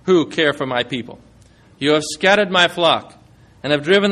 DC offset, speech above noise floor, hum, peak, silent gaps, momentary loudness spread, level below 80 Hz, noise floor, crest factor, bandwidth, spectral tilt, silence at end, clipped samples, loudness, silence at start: under 0.1%; 32 dB; none; 0 dBFS; none; 11 LU; -56 dBFS; -49 dBFS; 18 dB; 13 kHz; -4 dB/octave; 0 s; under 0.1%; -17 LUFS; 0.05 s